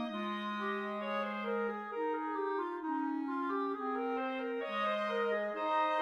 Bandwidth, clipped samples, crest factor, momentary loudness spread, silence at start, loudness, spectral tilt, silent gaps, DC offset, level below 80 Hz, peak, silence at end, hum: 11.5 kHz; under 0.1%; 12 dB; 4 LU; 0 s; -36 LUFS; -6 dB/octave; none; under 0.1%; -82 dBFS; -24 dBFS; 0 s; none